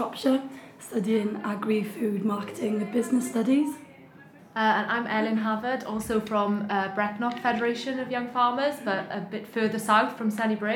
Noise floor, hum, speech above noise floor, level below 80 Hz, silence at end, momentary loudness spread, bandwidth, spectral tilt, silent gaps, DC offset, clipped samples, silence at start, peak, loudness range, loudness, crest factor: -51 dBFS; none; 24 dB; -64 dBFS; 0 s; 7 LU; 18 kHz; -5.5 dB/octave; none; under 0.1%; under 0.1%; 0 s; -8 dBFS; 1 LU; -27 LUFS; 18 dB